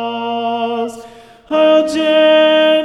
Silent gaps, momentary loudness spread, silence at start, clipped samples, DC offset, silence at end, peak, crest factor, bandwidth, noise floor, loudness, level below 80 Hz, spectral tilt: none; 10 LU; 0 s; under 0.1%; under 0.1%; 0 s; 0 dBFS; 12 dB; 11.5 kHz; -38 dBFS; -13 LUFS; -60 dBFS; -3.5 dB/octave